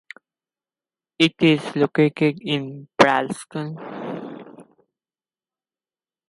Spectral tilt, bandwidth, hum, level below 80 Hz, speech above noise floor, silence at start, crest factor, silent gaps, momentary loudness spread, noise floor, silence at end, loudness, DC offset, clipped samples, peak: -5.5 dB/octave; 11.5 kHz; none; -66 dBFS; over 70 dB; 1.2 s; 22 dB; none; 16 LU; under -90 dBFS; 1.65 s; -21 LUFS; under 0.1%; under 0.1%; 0 dBFS